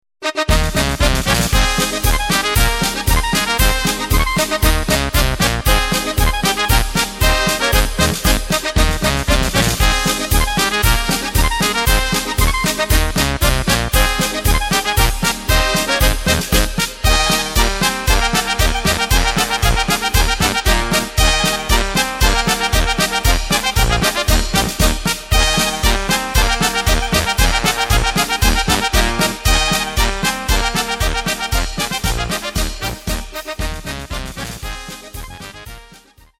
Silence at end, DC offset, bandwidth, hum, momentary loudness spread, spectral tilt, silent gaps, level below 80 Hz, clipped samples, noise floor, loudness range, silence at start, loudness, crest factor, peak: 0.55 s; under 0.1%; 17 kHz; none; 6 LU; -3 dB/octave; none; -20 dBFS; under 0.1%; -45 dBFS; 3 LU; 0.2 s; -16 LUFS; 16 dB; 0 dBFS